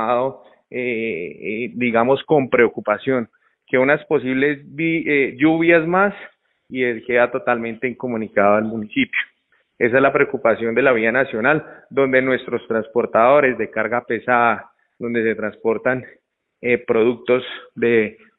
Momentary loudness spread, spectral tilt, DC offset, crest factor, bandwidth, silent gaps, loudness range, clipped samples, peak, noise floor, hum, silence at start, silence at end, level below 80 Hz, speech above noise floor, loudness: 10 LU; -10.5 dB/octave; under 0.1%; 18 dB; 4.1 kHz; none; 3 LU; under 0.1%; -2 dBFS; -63 dBFS; none; 0 s; 0.25 s; -60 dBFS; 45 dB; -19 LUFS